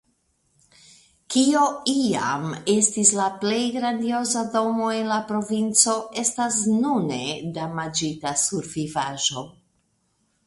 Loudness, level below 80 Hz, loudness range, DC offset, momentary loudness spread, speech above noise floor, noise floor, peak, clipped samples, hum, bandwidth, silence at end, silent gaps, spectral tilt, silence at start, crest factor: -22 LUFS; -64 dBFS; 4 LU; under 0.1%; 10 LU; 46 dB; -69 dBFS; -2 dBFS; under 0.1%; none; 11.5 kHz; 0.95 s; none; -3 dB/octave; 1.3 s; 22 dB